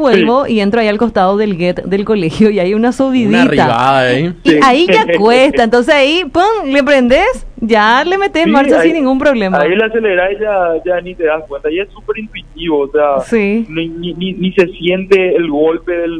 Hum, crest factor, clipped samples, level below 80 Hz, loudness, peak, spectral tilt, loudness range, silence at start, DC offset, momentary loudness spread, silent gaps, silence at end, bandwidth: none; 10 dB; 0.6%; -38 dBFS; -11 LUFS; 0 dBFS; -6 dB/octave; 6 LU; 0 s; under 0.1%; 9 LU; none; 0 s; 11 kHz